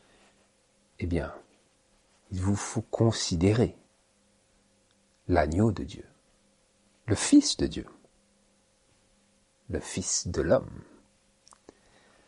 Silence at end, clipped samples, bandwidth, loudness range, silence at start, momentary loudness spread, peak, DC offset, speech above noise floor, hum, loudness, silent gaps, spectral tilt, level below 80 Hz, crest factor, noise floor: 1.5 s; under 0.1%; 11.5 kHz; 5 LU; 1 s; 23 LU; -8 dBFS; under 0.1%; 40 dB; none; -28 LUFS; none; -5 dB/octave; -48 dBFS; 24 dB; -67 dBFS